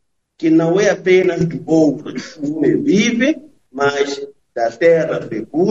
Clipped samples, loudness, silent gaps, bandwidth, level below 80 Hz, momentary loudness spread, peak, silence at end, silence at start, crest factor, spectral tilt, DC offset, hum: under 0.1%; -16 LUFS; none; 7.8 kHz; -54 dBFS; 12 LU; 0 dBFS; 0 s; 0.4 s; 14 dB; -5.5 dB/octave; 0.2%; none